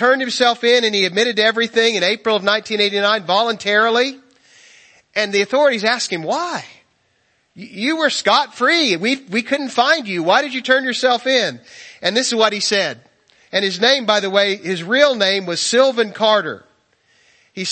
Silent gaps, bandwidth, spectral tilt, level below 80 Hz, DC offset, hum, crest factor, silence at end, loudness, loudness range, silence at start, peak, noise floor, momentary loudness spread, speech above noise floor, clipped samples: none; 8.8 kHz; -2.5 dB/octave; -70 dBFS; under 0.1%; none; 18 dB; 0 s; -16 LUFS; 4 LU; 0 s; 0 dBFS; -62 dBFS; 8 LU; 46 dB; under 0.1%